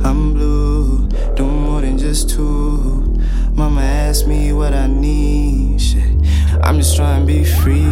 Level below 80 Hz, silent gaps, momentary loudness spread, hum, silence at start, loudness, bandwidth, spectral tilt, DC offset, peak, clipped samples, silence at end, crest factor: -14 dBFS; none; 5 LU; none; 0 s; -16 LUFS; 15.5 kHz; -6 dB/octave; under 0.1%; 0 dBFS; under 0.1%; 0 s; 12 dB